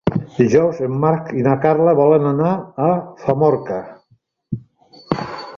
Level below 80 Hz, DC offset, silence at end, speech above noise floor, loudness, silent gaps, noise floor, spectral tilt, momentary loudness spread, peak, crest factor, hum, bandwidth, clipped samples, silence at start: -52 dBFS; under 0.1%; 0 s; 43 dB; -17 LUFS; none; -59 dBFS; -8.5 dB/octave; 14 LU; -2 dBFS; 16 dB; none; 7 kHz; under 0.1%; 0.05 s